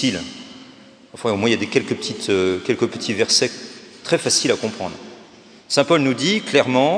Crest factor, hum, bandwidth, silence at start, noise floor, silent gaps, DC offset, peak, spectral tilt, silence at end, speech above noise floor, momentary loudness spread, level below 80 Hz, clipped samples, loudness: 20 dB; none; 10.5 kHz; 0 s; -45 dBFS; none; under 0.1%; 0 dBFS; -3.5 dB/octave; 0 s; 26 dB; 17 LU; -64 dBFS; under 0.1%; -19 LUFS